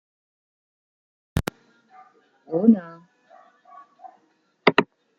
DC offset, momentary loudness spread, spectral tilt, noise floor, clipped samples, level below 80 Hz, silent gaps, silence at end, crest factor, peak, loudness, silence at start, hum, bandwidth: under 0.1%; 14 LU; -6.5 dB/octave; -65 dBFS; under 0.1%; -48 dBFS; none; 0.35 s; 26 dB; 0 dBFS; -22 LUFS; 1.35 s; none; 16 kHz